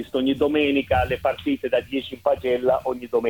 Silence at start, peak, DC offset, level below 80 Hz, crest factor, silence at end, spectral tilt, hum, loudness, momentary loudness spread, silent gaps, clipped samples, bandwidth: 0 s; -8 dBFS; under 0.1%; -44 dBFS; 16 dB; 0 s; -6.5 dB/octave; none; -23 LUFS; 5 LU; none; under 0.1%; 18.5 kHz